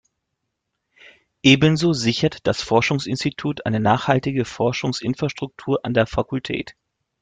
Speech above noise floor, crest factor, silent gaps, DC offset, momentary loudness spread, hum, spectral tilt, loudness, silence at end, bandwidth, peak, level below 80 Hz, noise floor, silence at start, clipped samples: 58 dB; 20 dB; none; under 0.1%; 10 LU; none; -5.5 dB/octave; -20 LUFS; 0.5 s; 9.4 kHz; 0 dBFS; -48 dBFS; -78 dBFS; 1.45 s; under 0.1%